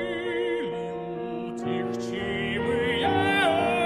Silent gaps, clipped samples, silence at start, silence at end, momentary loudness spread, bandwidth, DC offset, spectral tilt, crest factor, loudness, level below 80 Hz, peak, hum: none; under 0.1%; 0 s; 0 s; 11 LU; 13 kHz; under 0.1%; -5.5 dB/octave; 16 dB; -27 LUFS; -54 dBFS; -10 dBFS; none